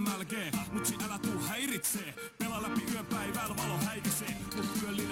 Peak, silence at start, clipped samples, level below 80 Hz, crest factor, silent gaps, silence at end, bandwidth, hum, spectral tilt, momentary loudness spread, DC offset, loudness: -20 dBFS; 0 s; under 0.1%; -60 dBFS; 16 dB; none; 0 s; 17 kHz; none; -3.5 dB/octave; 4 LU; under 0.1%; -35 LUFS